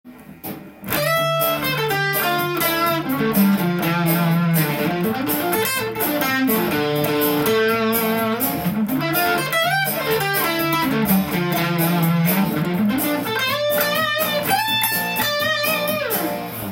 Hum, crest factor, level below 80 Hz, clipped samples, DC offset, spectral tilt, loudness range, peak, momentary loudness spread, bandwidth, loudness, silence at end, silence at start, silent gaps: none; 16 dB; -54 dBFS; under 0.1%; under 0.1%; -4.5 dB/octave; 1 LU; -4 dBFS; 3 LU; 17 kHz; -19 LUFS; 0 s; 0.05 s; none